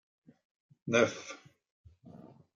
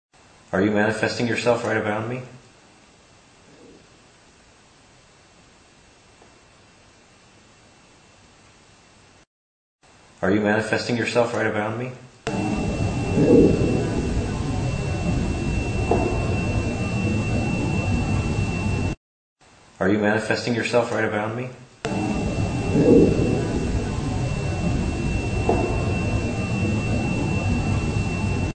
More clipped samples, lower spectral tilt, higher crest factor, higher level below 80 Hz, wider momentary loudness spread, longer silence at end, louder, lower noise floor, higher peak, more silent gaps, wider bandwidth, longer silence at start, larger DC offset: neither; second, -4 dB/octave vs -6.5 dB/octave; about the same, 24 dB vs 20 dB; second, -76 dBFS vs -34 dBFS; first, 26 LU vs 7 LU; first, 0.4 s vs 0 s; second, -31 LUFS vs -23 LUFS; about the same, -54 dBFS vs -53 dBFS; second, -14 dBFS vs -4 dBFS; second, 1.71-1.84 s vs 9.27-9.79 s, 18.97-19.36 s; second, 7.6 kHz vs 9.2 kHz; first, 0.85 s vs 0.55 s; neither